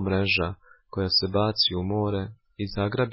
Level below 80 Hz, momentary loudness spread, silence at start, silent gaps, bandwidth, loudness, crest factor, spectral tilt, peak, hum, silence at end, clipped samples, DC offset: -44 dBFS; 14 LU; 0 s; none; 5.8 kHz; -25 LUFS; 16 dB; -8.5 dB/octave; -10 dBFS; none; 0 s; under 0.1%; under 0.1%